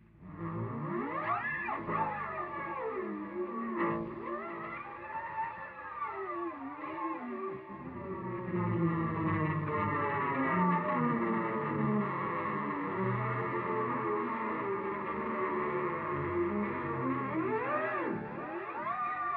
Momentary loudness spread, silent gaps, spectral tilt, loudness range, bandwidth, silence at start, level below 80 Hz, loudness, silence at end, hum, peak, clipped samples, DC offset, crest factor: 9 LU; none; -7 dB/octave; 8 LU; 4.9 kHz; 0.15 s; -66 dBFS; -35 LUFS; 0 s; none; -18 dBFS; under 0.1%; under 0.1%; 16 dB